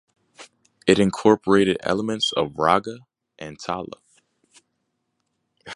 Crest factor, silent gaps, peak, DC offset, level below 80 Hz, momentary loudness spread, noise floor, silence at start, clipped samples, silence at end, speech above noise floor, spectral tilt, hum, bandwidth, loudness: 22 dB; none; -2 dBFS; under 0.1%; -56 dBFS; 20 LU; -75 dBFS; 0.4 s; under 0.1%; 0 s; 54 dB; -5 dB/octave; none; 11.5 kHz; -21 LUFS